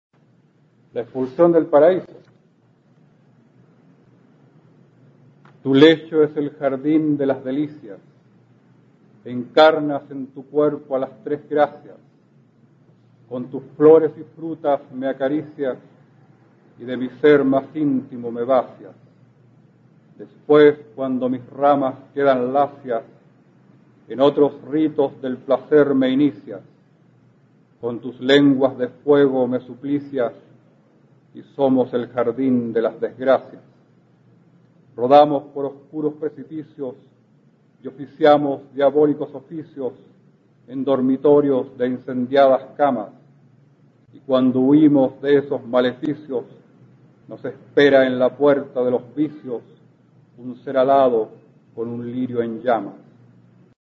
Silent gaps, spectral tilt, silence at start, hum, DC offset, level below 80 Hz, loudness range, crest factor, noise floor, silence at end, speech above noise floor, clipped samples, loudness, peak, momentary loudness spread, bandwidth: none; -8 dB/octave; 0.95 s; none; under 0.1%; -70 dBFS; 4 LU; 20 dB; -57 dBFS; 1.05 s; 39 dB; under 0.1%; -19 LUFS; 0 dBFS; 18 LU; 7.2 kHz